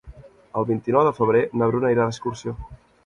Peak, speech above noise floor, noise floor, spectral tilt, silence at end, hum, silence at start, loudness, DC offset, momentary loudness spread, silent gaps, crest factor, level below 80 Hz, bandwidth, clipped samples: -4 dBFS; 24 dB; -45 dBFS; -7.5 dB/octave; 0.3 s; none; 0.05 s; -21 LUFS; under 0.1%; 13 LU; none; 18 dB; -48 dBFS; 9.6 kHz; under 0.1%